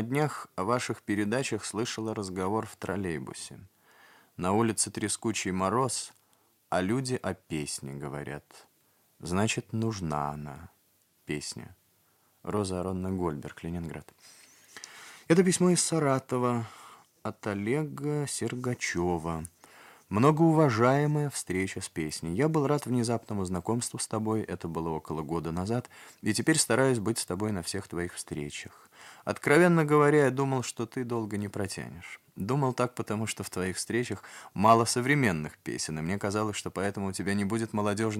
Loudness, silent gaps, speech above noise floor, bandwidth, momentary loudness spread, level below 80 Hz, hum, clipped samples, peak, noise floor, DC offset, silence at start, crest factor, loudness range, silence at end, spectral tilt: -29 LUFS; none; 39 dB; 16.5 kHz; 16 LU; -64 dBFS; none; under 0.1%; -8 dBFS; -68 dBFS; under 0.1%; 0 s; 22 dB; 8 LU; 0 s; -5 dB/octave